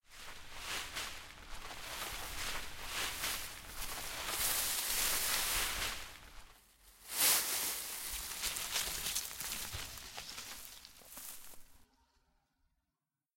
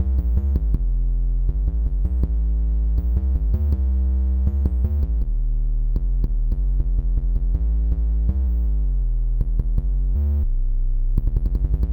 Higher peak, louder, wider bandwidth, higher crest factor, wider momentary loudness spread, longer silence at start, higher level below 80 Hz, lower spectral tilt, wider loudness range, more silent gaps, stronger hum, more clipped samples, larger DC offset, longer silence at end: second, -16 dBFS vs -4 dBFS; second, -36 LUFS vs -24 LUFS; first, 17 kHz vs 1.3 kHz; first, 24 dB vs 14 dB; first, 19 LU vs 3 LU; about the same, 0.1 s vs 0 s; second, -56 dBFS vs -20 dBFS; second, 0.5 dB/octave vs -11.5 dB/octave; first, 11 LU vs 2 LU; neither; neither; neither; neither; first, 1.55 s vs 0 s